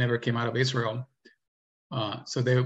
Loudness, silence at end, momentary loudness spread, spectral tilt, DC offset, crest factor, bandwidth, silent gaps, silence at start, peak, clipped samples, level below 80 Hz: -29 LUFS; 0 s; 11 LU; -6 dB/octave; under 0.1%; 18 dB; 8 kHz; 1.48-1.90 s; 0 s; -10 dBFS; under 0.1%; -68 dBFS